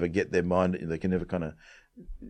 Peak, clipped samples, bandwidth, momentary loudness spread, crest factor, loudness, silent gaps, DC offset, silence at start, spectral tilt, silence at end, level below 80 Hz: -10 dBFS; under 0.1%; 9 kHz; 8 LU; 20 dB; -29 LUFS; none; under 0.1%; 0 s; -7.5 dB/octave; 0 s; -50 dBFS